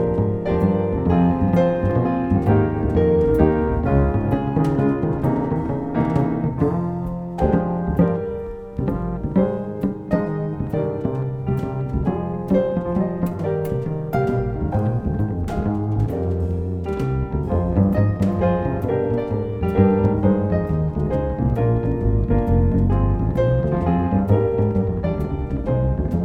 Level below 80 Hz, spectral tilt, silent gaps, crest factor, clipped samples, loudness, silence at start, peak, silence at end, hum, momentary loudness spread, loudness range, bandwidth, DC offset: -30 dBFS; -10.5 dB/octave; none; 18 dB; under 0.1%; -21 LUFS; 0 s; -2 dBFS; 0 s; none; 7 LU; 4 LU; 6.2 kHz; under 0.1%